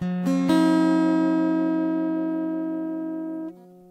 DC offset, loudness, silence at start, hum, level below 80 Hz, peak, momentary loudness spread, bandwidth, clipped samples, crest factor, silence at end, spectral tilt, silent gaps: under 0.1%; -23 LUFS; 0 s; none; -70 dBFS; -10 dBFS; 12 LU; 11 kHz; under 0.1%; 12 dB; 0.3 s; -7.5 dB/octave; none